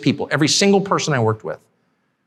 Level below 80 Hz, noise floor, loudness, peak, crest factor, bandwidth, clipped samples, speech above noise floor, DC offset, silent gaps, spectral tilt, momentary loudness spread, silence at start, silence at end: -60 dBFS; -66 dBFS; -17 LUFS; -2 dBFS; 16 dB; 13.5 kHz; under 0.1%; 49 dB; under 0.1%; none; -4 dB/octave; 15 LU; 0 s; 0.7 s